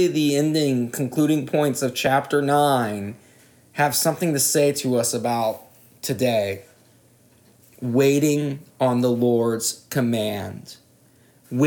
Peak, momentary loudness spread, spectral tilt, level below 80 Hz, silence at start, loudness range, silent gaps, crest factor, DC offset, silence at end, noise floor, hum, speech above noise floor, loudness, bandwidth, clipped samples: -6 dBFS; 13 LU; -4.5 dB/octave; -70 dBFS; 0 s; 3 LU; none; 16 dB; under 0.1%; 0 s; -56 dBFS; none; 35 dB; -21 LUFS; 19.5 kHz; under 0.1%